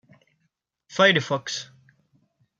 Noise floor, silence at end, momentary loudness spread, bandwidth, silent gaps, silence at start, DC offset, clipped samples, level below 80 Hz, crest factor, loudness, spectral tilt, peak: -75 dBFS; 0.95 s; 16 LU; 7.8 kHz; none; 0.9 s; under 0.1%; under 0.1%; -72 dBFS; 22 dB; -22 LUFS; -3.5 dB/octave; -4 dBFS